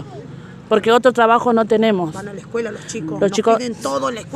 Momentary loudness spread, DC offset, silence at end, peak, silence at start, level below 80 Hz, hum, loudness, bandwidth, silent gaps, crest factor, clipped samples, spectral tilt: 18 LU; under 0.1%; 0 s; 0 dBFS; 0 s; -58 dBFS; none; -17 LUFS; 13.5 kHz; none; 16 dB; under 0.1%; -5 dB/octave